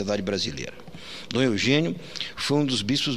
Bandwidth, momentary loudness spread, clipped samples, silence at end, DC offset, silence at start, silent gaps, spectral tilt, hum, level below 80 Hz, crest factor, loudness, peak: 14.5 kHz; 16 LU; under 0.1%; 0 s; 0.6%; 0 s; none; -4.5 dB/octave; none; -56 dBFS; 20 dB; -25 LUFS; -6 dBFS